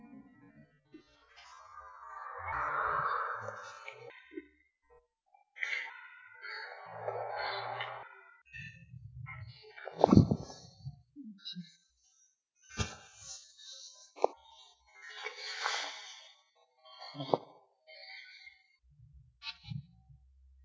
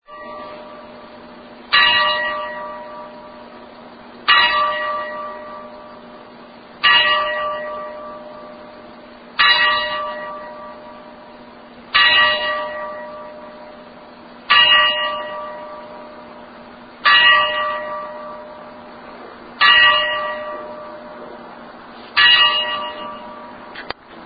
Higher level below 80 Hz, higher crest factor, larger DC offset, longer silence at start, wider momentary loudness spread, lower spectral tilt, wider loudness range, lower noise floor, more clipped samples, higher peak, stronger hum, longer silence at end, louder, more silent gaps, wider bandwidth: about the same, -56 dBFS vs -56 dBFS; first, 34 dB vs 20 dB; neither; about the same, 0 s vs 0.1 s; second, 21 LU vs 26 LU; first, -5.5 dB/octave vs -4 dB/octave; first, 11 LU vs 4 LU; first, -72 dBFS vs -40 dBFS; neither; second, -4 dBFS vs 0 dBFS; neither; first, 0.5 s vs 0 s; second, -37 LUFS vs -14 LUFS; neither; first, 8 kHz vs 5 kHz